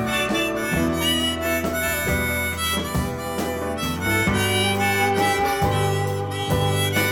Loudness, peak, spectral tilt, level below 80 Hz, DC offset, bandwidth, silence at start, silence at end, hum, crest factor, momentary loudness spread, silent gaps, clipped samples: -22 LUFS; -8 dBFS; -4 dB/octave; -38 dBFS; under 0.1%; 18 kHz; 0 s; 0 s; none; 14 dB; 6 LU; none; under 0.1%